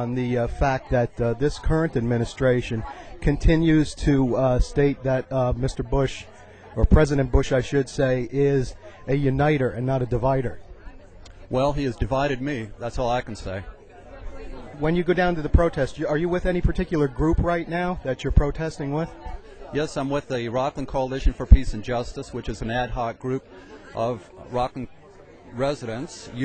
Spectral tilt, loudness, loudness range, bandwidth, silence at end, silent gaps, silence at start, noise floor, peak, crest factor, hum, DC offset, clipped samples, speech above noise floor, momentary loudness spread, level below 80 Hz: -7 dB/octave; -24 LUFS; 6 LU; 9.2 kHz; 0 s; none; 0 s; -47 dBFS; -2 dBFS; 22 dB; none; under 0.1%; under 0.1%; 25 dB; 14 LU; -30 dBFS